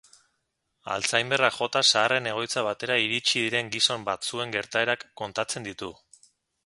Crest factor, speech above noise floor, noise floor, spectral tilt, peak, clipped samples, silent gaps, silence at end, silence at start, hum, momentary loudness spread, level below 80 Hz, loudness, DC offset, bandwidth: 24 dB; 51 dB; -77 dBFS; -2 dB/octave; -4 dBFS; under 0.1%; none; 0.75 s; 0.85 s; none; 12 LU; -68 dBFS; -25 LUFS; under 0.1%; 11.5 kHz